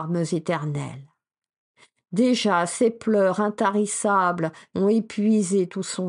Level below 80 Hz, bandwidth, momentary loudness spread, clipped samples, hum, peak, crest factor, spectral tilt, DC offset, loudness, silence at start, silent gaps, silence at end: -70 dBFS; 11.5 kHz; 8 LU; under 0.1%; none; -8 dBFS; 16 dB; -5 dB/octave; under 0.1%; -23 LUFS; 0 s; 1.57-1.74 s; 0 s